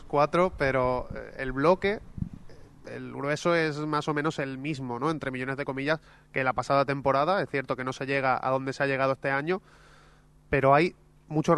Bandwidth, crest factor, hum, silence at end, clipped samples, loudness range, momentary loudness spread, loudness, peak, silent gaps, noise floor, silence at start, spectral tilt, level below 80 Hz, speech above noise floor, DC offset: 11.5 kHz; 20 dB; none; 0 s; under 0.1%; 3 LU; 10 LU; -27 LUFS; -8 dBFS; none; -57 dBFS; 0 s; -6.5 dB/octave; -50 dBFS; 30 dB; under 0.1%